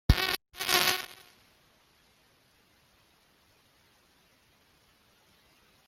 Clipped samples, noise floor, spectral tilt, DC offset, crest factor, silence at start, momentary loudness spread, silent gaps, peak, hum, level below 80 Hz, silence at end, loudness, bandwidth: under 0.1%; -66 dBFS; -3 dB/octave; under 0.1%; 32 dB; 0.1 s; 19 LU; none; -2 dBFS; none; -42 dBFS; 4.75 s; -28 LUFS; 16.5 kHz